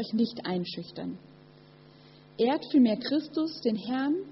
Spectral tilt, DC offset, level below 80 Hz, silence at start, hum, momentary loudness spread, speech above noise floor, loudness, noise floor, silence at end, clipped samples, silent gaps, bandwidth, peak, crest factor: -5 dB/octave; under 0.1%; -72 dBFS; 0 s; none; 15 LU; 26 dB; -29 LUFS; -54 dBFS; 0 s; under 0.1%; none; 6 kHz; -14 dBFS; 16 dB